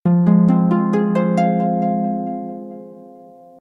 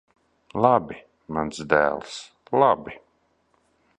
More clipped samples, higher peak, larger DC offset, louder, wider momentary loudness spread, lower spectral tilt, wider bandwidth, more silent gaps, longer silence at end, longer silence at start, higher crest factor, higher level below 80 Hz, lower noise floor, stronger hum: neither; about the same, -4 dBFS vs -2 dBFS; neither; first, -17 LUFS vs -23 LUFS; about the same, 18 LU vs 19 LU; first, -10 dB/octave vs -5.5 dB/octave; second, 6 kHz vs 10.5 kHz; neither; second, 0.5 s vs 1.05 s; second, 0.05 s vs 0.55 s; second, 14 dB vs 24 dB; about the same, -58 dBFS vs -56 dBFS; second, -42 dBFS vs -67 dBFS; neither